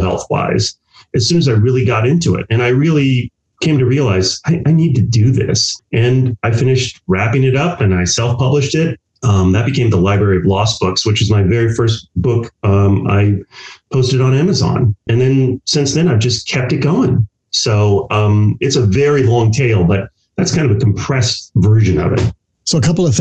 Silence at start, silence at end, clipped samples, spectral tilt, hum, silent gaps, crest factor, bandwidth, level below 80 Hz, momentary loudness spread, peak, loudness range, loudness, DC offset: 0 s; 0 s; under 0.1%; -5.5 dB/octave; none; none; 8 dB; 8.6 kHz; -38 dBFS; 5 LU; -4 dBFS; 1 LU; -14 LUFS; under 0.1%